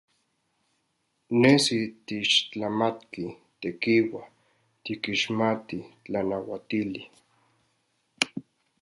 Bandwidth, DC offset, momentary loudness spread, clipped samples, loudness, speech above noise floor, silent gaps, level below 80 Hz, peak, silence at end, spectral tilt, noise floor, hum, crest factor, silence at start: 11.5 kHz; under 0.1%; 17 LU; under 0.1%; -26 LUFS; 48 dB; none; -66 dBFS; -2 dBFS; 0.4 s; -4 dB/octave; -75 dBFS; none; 26 dB; 1.3 s